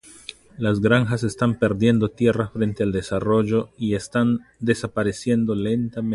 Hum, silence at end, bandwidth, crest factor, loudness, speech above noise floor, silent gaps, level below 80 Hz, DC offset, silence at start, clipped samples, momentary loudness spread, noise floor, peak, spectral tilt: none; 0 s; 11.5 kHz; 18 dB; -22 LUFS; 22 dB; none; -48 dBFS; under 0.1%; 0.05 s; under 0.1%; 6 LU; -43 dBFS; -4 dBFS; -7 dB/octave